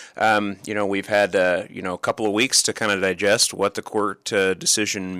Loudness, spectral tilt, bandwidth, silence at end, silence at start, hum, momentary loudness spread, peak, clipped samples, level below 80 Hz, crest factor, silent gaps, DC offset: -20 LUFS; -2 dB/octave; 15.5 kHz; 0 s; 0 s; none; 8 LU; -6 dBFS; under 0.1%; -64 dBFS; 16 dB; none; under 0.1%